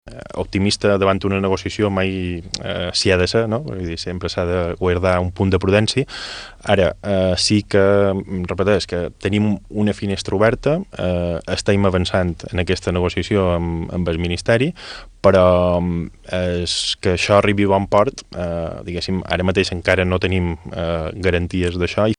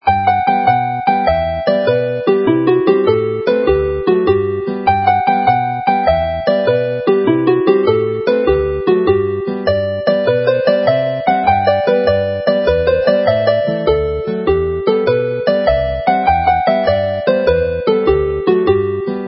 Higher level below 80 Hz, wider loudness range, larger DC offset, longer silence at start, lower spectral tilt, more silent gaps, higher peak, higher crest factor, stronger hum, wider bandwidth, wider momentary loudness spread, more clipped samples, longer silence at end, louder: second, -38 dBFS vs -32 dBFS; about the same, 3 LU vs 1 LU; neither; about the same, 0.05 s vs 0.05 s; second, -5.5 dB/octave vs -11.5 dB/octave; neither; about the same, 0 dBFS vs 0 dBFS; about the same, 18 dB vs 14 dB; neither; first, 10.5 kHz vs 5.8 kHz; first, 10 LU vs 3 LU; neither; about the same, 0.05 s vs 0 s; second, -19 LUFS vs -14 LUFS